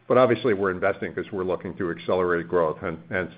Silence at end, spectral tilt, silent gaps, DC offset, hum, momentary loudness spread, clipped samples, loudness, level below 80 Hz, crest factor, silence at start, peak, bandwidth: 0 s; -11 dB/octave; none; under 0.1%; none; 10 LU; under 0.1%; -25 LUFS; -58 dBFS; 20 dB; 0.1 s; -4 dBFS; 4.9 kHz